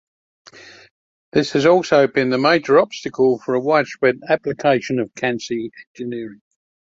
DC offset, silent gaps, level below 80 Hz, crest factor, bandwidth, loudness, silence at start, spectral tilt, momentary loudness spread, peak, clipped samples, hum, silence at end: under 0.1%; 0.91-1.32 s, 5.87-5.95 s; -62 dBFS; 18 dB; 7.8 kHz; -18 LUFS; 0.55 s; -5.5 dB/octave; 14 LU; -2 dBFS; under 0.1%; none; 0.6 s